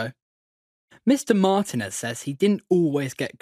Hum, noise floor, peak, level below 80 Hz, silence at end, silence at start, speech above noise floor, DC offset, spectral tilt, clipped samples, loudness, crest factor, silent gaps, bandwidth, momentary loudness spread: none; under -90 dBFS; -4 dBFS; -70 dBFS; 0.15 s; 0 s; over 68 dB; under 0.1%; -5.5 dB/octave; under 0.1%; -23 LUFS; 20 dB; 0.22-0.88 s; 15.5 kHz; 9 LU